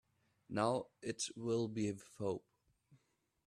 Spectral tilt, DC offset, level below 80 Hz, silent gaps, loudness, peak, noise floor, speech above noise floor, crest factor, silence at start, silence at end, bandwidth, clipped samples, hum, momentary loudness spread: -5 dB/octave; under 0.1%; -76 dBFS; none; -41 LUFS; -20 dBFS; -81 dBFS; 41 dB; 22 dB; 0.5 s; 0.5 s; 13 kHz; under 0.1%; none; 8 LU